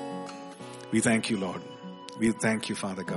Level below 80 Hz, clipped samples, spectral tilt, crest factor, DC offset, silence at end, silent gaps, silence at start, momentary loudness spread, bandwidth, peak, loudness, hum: -64 dBFS; under 0.1%; -4.5 dB/octave; 18 dB; under 0.1%; 0 s; none; 0 s; 17 LU; 11.5 kHz; -12 dBFS; -29 LUFS; none